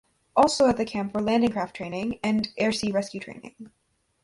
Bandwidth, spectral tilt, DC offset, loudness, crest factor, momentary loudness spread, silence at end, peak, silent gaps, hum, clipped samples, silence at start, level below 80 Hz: 11.5 kHz; -5 dB/octave; under 0.1%; -25 LUFS; 20 dB; 15 LU; 0.55 s; -6 dBFS; none; none; under 0.1%; 0.35 s; -56 dBFS